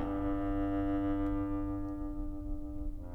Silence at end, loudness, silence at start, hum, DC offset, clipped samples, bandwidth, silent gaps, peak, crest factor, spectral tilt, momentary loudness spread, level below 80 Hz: 0 s; -36 LUFS; 0 s; none; under 0.1%; under 0.1%; 3.8 kHz; none; -22 dBFS; 12 dB; -10 dB/octave; 9 LU; -40 dBFS